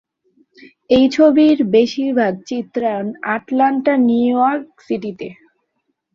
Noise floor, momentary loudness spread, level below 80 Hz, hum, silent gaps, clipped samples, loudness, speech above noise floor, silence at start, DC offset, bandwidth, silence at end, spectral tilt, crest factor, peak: -71 dBFS; 14 LU; -54 dBFS; none; none; under 0.1%; -16 LUFS; 55 dB; 0.9 s; under 0.1%; 7.2 kHz; 0.8 s; -6 dB/octave; 14 dB; -2 dBFS